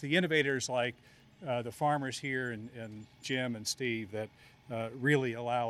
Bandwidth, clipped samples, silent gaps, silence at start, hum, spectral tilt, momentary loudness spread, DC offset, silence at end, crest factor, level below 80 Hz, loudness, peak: 14.5 kHz; under 0.1%; none; 0 s; none; -4.5 dB/octave; 15 LU; under 0.1%; 0 s; 20 dB; -72 dBFS; -33 LUFS; -14 dBFS